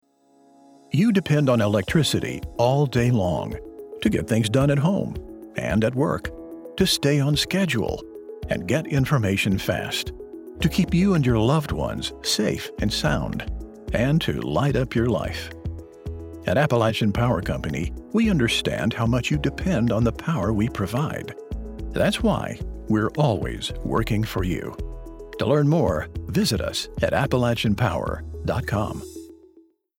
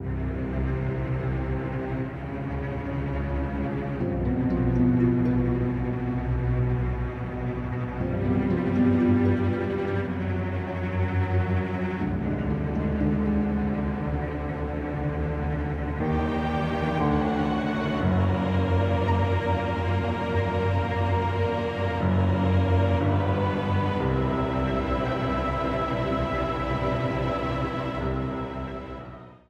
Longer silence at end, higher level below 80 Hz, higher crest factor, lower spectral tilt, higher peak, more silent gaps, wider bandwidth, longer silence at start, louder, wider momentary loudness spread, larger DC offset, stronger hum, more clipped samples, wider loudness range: first, 0.65 s vs 0.15 s; about the same, -38 dBFS vs -36 dBFS; about the same, 18 dB vs 14 dB; second, -6 dB/octave vs -9 dB/octave; first, -6 dBFS vs -10 dBFS; neither; first, 16.5 kHz vs 7 kHz; first, 0.9 s vs 0 s; first, -23 LUFS vs -26 LUFS; first, 15 LU vs 7 LU; neither; neither; neither; about the same, 3 LU vs 4 LU